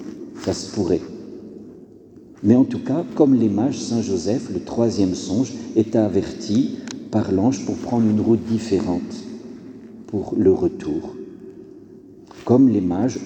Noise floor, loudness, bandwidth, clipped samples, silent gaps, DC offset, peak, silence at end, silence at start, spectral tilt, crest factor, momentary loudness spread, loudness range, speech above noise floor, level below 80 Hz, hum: -44 dBFS; -20 LUFS; 9 kHz; under 0.1%; none; under 0.1%; -2 dBFS; 0 s; 0 s; -7 dB/octave; 18 dB; 20 LU; 4 LU; 25 dB; -54 dBFS; none